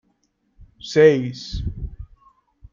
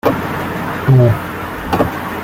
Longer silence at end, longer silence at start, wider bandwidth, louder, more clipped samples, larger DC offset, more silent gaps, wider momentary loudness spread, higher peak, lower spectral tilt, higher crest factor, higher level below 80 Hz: first, 0.7 s vs 0 s; first, 0.6 s vs 0.05 s; second, 7.4 kHz vs 16.5 kHz; second, -19 LUFS vs -16 LUFS; neither; neither; neither; first, 21 LU vs 10 LU; about the same, -2 dBFS vs -2 dBFS; second, -6 dB/octave vs -7.5 dB/octave; first, 20 dB vs 14 dB; about the same, -38 dBFS vs -38 dBFS